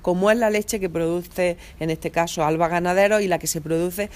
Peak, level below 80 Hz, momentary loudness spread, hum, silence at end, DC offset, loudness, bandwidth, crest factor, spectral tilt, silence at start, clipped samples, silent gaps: -4 dBFS; -46 dBFS; 7 LU; none; 0 s; under 0.1%; -22 LUFS; 15.5 kHz; 18 dB; -4.5 dB/octave; 0 s; under 0.1%; none